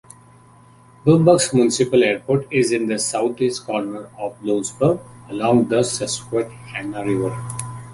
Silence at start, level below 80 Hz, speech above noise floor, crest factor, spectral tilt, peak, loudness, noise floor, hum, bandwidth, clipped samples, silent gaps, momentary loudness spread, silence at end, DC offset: 1.05 s; -54 dBFS; 29 dB; 18 dB; -5 dB/octave; -2 dBFS; -20 LUFS; -48 dBFS; none; 11.5 kHz; under 0.1%; none; 14 LU; 0 s; under 0.1%